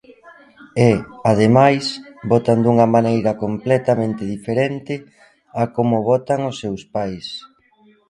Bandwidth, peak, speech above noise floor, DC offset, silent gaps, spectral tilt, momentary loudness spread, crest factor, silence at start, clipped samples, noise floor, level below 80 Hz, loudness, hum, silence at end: 11.5 kHz; 0 dBFS; 37 dB; under 0.1%; none; -7 dB/octave; 14 LU; 18 dB; 0.25 s; under 0.1%; -54 dBFS; -52 dBFS; -18 LUFS; none; 0.7 s